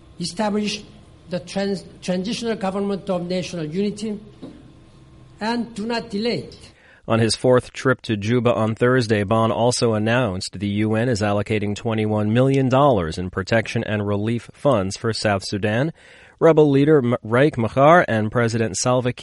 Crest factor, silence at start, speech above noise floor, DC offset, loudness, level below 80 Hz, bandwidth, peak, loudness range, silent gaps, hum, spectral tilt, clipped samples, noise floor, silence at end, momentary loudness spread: 18 dB; 0.2 s; 27 dB; under 0.1%; -20 LUFS; -50 dBFS; 11.5 kHz; -2 dBFS; 9 LU; none; none; -6 dB/octave; under 0.1%; -47 dBFS; 0 s; 10 LU